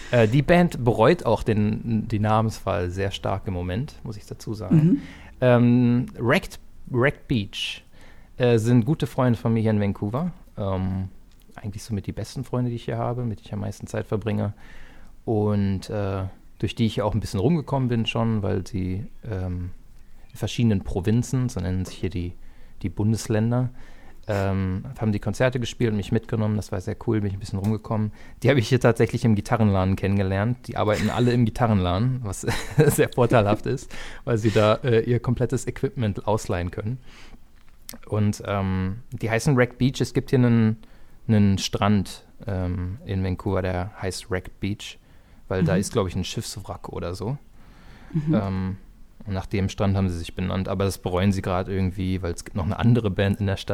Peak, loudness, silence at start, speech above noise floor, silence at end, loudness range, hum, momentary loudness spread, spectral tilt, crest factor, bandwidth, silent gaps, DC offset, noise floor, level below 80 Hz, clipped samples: -2 dBFS; -24 LUFS; 0 s; 24 dB; 0 s; 6 LU; none; 13 LU; -6.5 dB/octave; 22 dB; 15.5 kHz; none; under 0.1%; -47 dBFS; -42 dBFS; under 0.1%